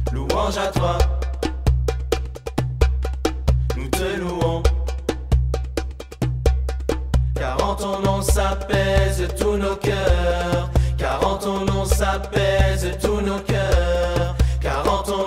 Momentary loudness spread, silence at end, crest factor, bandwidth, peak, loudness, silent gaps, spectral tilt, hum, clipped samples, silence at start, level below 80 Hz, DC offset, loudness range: 6 LU; 0 s; 18 dB; 15.5 kHz; -2 dBFS; -22 LUFS; none; -5.5 dB/octave; none; under 0.1%; 0 s; -24 dBFS; under 0.1%; 3 LU